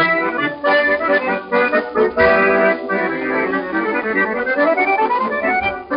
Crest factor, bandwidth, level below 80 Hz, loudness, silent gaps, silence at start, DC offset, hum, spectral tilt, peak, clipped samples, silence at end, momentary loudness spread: 16 dB; 5.4 kHz; -48 dBFS; -16 LUFS; none; 0 s; under 0.1%; none; -2.5 dB/octave; 0 dBFS; under 0.1%; 0 s; 6 LU